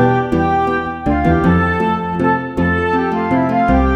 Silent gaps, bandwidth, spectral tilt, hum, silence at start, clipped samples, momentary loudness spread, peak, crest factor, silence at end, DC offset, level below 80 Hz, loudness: none; 8.4 kHz; -8.5 dB/octave; none; 0 s; under 0.1%; 4 LU; 0 dBFS; 14 dB; 0 s; under 0.1%; -28 dBFS; -15 LUFS